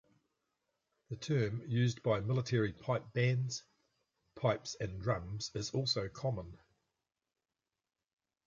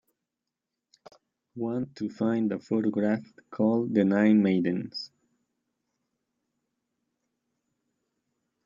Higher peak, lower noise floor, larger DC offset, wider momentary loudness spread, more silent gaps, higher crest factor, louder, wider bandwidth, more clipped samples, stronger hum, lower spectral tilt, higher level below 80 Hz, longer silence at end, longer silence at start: second, -18 dBFS vs -10 dBFS; about the same, under -90 dBFS vs -87 dBFS; neither; second, 8 LU vs 15 LU; neither; about the same, 20 dB vs 20 dB; second, -36 LUFS vs -27 LUFS; about the same, 7.6 kHz vs 7.4 kHz; neither; neither; second, -5.5 dB/octave vs -8.5 dB/octave; first, -62 dBFS vs -74 dBFS; second, 1.9 s vs 3.6 s; second, 1.1 s vs 1.55 s